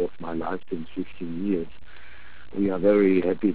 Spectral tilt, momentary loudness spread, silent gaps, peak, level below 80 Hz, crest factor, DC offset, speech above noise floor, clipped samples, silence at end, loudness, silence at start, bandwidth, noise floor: -11.5 dB/octave; 15 LU; none; -8 dBFS; -52 dBFS; 18 dB; 2%; 25 dB; under 0.1%; 0 s; -25 LUFS; 0 s; 4 kHz; -48 dBFS